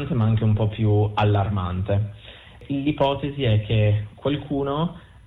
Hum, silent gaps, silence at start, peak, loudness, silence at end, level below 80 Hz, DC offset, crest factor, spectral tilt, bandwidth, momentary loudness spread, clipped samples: none; none; 0 s; -10 dBFS; -23 LUFS; 0.25 s; -42 dBFS; under 0.1%; 12 dB; -9.5 dB/octave; 4 kHz; 7 LU; under 0.1%